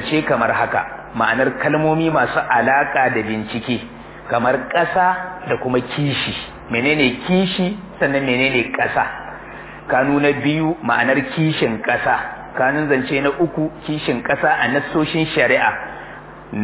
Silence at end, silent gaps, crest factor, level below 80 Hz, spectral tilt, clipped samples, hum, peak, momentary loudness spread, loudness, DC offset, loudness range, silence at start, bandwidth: 0 s; none; 16 dB; -48 dBFS; -9.5 dB/octave; under 0.1%; none; -2 dBFS; 10 LU; -18 LUFS; under 0.1%; 2 LU; 0 s; 4 kHz